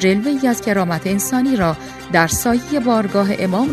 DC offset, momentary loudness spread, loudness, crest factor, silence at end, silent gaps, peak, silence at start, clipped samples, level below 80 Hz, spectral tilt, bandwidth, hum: under 0.1%; 3 LU; -17 LUFS; 16 dB; 0 s; none; 0 dBFS; 0 s; under 0.1%; -44 dBFS; -5 dB/octave; 14 kHz; none